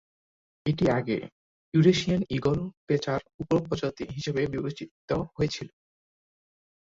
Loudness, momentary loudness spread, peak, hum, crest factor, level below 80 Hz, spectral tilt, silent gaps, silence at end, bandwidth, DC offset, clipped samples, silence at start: -28 LUFS; 12 LU; -8 dBFS; none; 20 dB; -54 dBFS; -6.5 dB/octave; 1.32-1.72 s, 2.77-2.87 s, 3.34-3.39 s, 4.91-5.08 s; 1.2 s; 7.8 kHz; under 0.1%; under 0.1%; 0.65 s